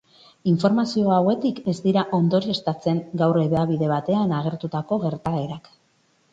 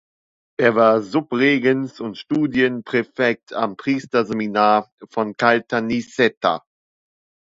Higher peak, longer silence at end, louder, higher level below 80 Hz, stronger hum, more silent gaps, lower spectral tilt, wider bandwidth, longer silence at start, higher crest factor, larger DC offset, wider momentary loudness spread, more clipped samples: second, -6 dBFS vs 0 dBFS; second, 0.75 s vs 1 s; second, -22 LUFS vs -19 LUFS; about the same, -58 dBFS vs -62 dBFS; neither; second, none vs 4.92-4.98 s, 6.37-6.41 s; first, -8 dB/octave vs -6 dB/octave; about the same, 7.8 kHz vs 7.8 kHz; second, 0.45 s vs 0.6 s; about the same, 16 dB vs 20 dB; neither; about the same, 7 LU vs 9 LU; neither